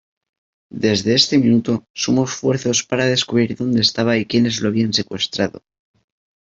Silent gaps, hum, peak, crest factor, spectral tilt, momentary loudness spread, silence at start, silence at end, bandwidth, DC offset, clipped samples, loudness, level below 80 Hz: 1.90-1.94 s; none; -2 dBFS; 18 dB; -4.5 dB/octave; 8 LU; 0.75 s; 0.9 s; 7.8 kHz; under 0.1%; under 0.1%; -17 LUFS; -56 dBFS